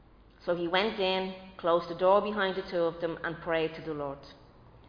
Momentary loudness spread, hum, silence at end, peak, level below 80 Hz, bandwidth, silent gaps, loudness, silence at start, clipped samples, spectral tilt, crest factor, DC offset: 12 LU; none; 0.1 s; -12 dBFS; -60 dBFS; 5.2 kHz; none; -30 LUFS; 0.4 s; under 0.1%; -7 dB/octave; 18 dB; under 0.1%